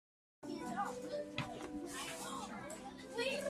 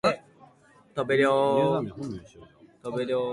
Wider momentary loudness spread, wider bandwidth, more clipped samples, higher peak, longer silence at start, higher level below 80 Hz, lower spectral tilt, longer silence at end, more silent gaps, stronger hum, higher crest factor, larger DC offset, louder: second, 8 LU vs 16 LU; first, 15.5 kHz vs 11.5 kHz; neither; second, -24 dBFS vs -10 dBFS; first, 0.4 s vs 0.05 s; second, -70 dBFS vs -62 dBFS; second, -3.5 dB/octave vs -6 dB/octave; about the same, 0 s vs 0 s; neither; neither; about the same, 20 dB vs 18 dB; neither; second, -44 LUFS vs -26 LUFS